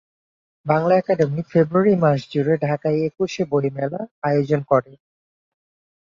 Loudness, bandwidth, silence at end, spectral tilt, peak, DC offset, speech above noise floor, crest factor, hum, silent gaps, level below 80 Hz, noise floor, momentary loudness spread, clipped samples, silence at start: -20 LUFS; 7.4 kHz; 1.2 s; -8 dB/octave; -2 dBFS; under 0.1%; over 71 dB; 18 dB; none; 4.11-4.22 s; -62 dBFS; under -90 dBFS; 7 LU; under 0.1%; 0.65 s